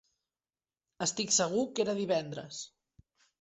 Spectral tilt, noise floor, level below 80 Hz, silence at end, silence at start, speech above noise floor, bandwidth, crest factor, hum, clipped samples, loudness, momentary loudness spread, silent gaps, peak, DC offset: -3 dB/octave; under -90 dBFS; -74 dBFS; 0.75 s; 1 s; over 58 dB; 8.2 kHz; 20 dB; none; under 0.1%; -31 LUFS; 16 LU; none; -16 dBFS; under 0.1%